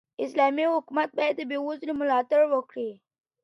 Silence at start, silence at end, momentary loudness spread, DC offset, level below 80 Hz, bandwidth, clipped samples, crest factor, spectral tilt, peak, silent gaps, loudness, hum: 0.2 s; 0.5 s; 9 LU; under 0.1%; -76 dBFS; 11 kHz; under 0.1%; 16 dB; -5 dB/octave; -10 dBFS; none; -26 LUFS; none